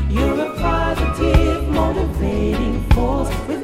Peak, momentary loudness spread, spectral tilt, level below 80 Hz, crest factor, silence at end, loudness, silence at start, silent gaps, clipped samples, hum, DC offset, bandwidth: 0 dBFS; 4 LU; -7 dB/octave; -22 dBFS; 16 dB; 0 s; -19 LUFS; 0 s; none; under 0.1%; none; under 0.1%; 15 kHz